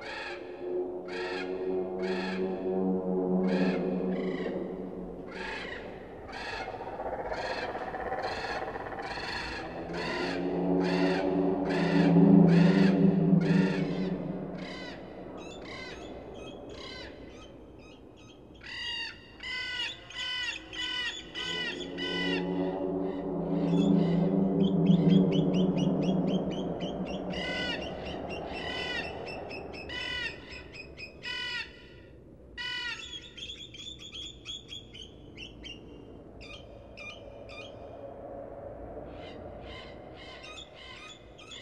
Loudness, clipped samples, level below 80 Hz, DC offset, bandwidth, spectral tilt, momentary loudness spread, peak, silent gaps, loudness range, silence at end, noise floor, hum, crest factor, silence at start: -30 LUFS; under 0.1%; -56 dBFS; under 0.1%; 8.8 kHz; -7 dB/octave; 20 LU; -8 dBFS; none; 19 LU; 0 s; -51 dBFS; none; 22 dB; 0 s